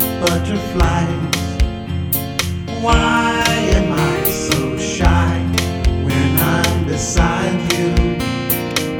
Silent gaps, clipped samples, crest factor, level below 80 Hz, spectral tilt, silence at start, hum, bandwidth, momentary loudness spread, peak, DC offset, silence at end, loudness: none; under 0.1%; 16 dB; -24 dBFS; -5 dB/octave; 0 s; none; over 20 kHz; 6 LU; 0 dBFS; under 0.1%; 0 s; -17 LUFS